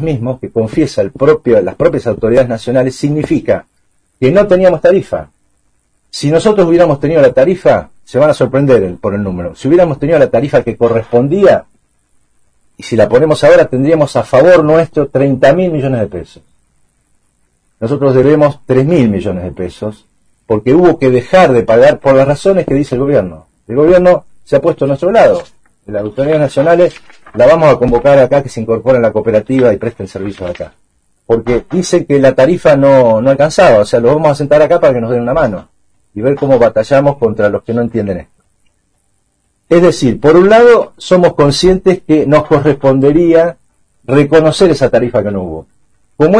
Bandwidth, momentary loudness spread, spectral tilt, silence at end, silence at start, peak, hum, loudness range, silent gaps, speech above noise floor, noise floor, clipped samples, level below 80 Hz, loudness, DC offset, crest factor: 10.5 kHz; 11 LU; -7 dB/octave; 0 s; 0 s; 0 dBFS; none; 5 LU; none; 51 dB; -60 dBFS; 0.5%; -36 dBFS; -10 LUFS; under 0.1%; 10 dB